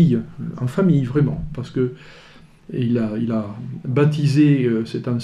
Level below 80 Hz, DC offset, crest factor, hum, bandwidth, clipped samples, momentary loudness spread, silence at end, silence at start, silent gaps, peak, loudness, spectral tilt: -46 dBFS; under 0.1%; 14 dB; none; 10.5 kHz; under 0.1%; 14 LU; 0 s; 0 s; none; -4 dBFS; -20 LUFS; -8.5 dB/octave